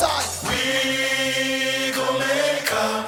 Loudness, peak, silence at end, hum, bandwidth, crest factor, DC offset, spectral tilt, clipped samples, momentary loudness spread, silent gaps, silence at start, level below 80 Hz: -21 LUFS; -6 dBFS; 0 s; none; 17 kHz; 16 dB; under 0.1%; -2 dB/octave; under 0.1%; 2 LU; none; 0 s; -52 dBFS